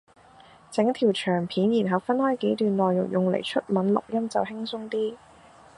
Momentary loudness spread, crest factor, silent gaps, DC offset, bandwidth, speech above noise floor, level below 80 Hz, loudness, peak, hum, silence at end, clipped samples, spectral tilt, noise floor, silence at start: 7 LU; 18 dB; none; under 0.1%; 11 kHz; 28 dB; -66 dBFS; -25 LUFS; -6 dBFS; none; 0.6 s; under 0.1%; -6.5 dB/octave; -52 dBFS; 0.7 s